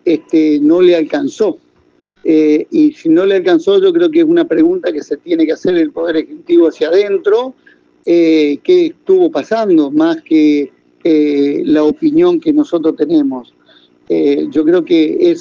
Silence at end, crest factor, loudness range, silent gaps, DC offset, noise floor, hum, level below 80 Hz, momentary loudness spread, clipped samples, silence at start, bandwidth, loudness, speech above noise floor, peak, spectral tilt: 0 s; 12 dB; 2 LU; none; under 0.1%; -54 dBFS; none; -60 dBFS; 7 LU; under 0.1%; 0.05 s; 7.2 kHz; -12 LUFS; 43 dB; 0 dBFS; -6.5 dB/octave